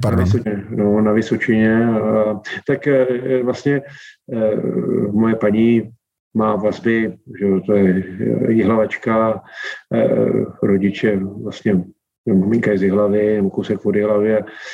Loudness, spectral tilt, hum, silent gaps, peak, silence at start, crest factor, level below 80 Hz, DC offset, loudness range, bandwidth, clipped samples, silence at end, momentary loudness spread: -17 LUFS; -8.5 dB/octave; none; 6.20-6.31 s, 12.18-12.24 s; -4 dBFS; 0 s; 14 dB; -56 dBFS; under 0.1%; 2 LU; 8.8 kHz; under 0.1%; 0 s; 7 LU